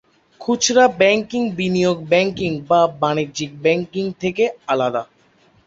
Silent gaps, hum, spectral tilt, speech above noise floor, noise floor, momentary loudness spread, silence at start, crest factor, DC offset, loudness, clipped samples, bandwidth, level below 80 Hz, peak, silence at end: none; none; -4 dB/octave; 37 dB; -55 dBFS; 10 LU; 0.4 s; 18 dB; under 0.1%; -18 LUFS; under 0.1%; 8 kHz; -56 dBFS; 0 dBFS; 0.6 s